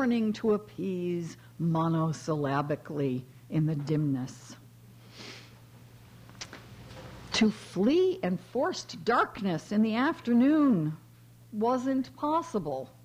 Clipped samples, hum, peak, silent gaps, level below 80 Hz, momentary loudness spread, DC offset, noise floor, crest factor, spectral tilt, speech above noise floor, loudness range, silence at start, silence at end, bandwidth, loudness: under 0.1%; none; -14 dBFS; none; -64 dBFS; 20 LU; under 0.1%; -53 dBFS; 16 dB; -6.5 dB/octave; 24 dB; 8 LU; 0 s; 0.2 s; 15.5 kHz; -29 LUFS